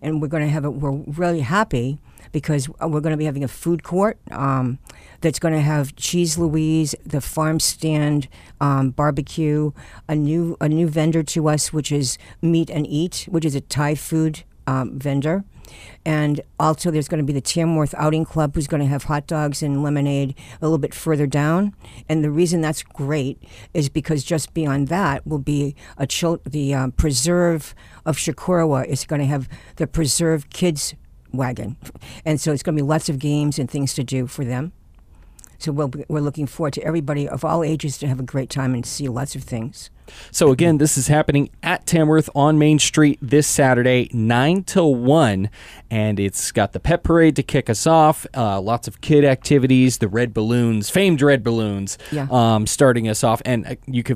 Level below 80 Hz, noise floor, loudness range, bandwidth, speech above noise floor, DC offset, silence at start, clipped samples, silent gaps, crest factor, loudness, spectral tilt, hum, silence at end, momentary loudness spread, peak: -40 dBFS; -46 dBFS; 7 LU; 15.5 kHz; 27 dB; under 0.1%; 0 s; under 0.1%; none; 16 dB; -20 LUFS; -5.5 dB/octave; none; 0 s; 10 LU; -4 dBFS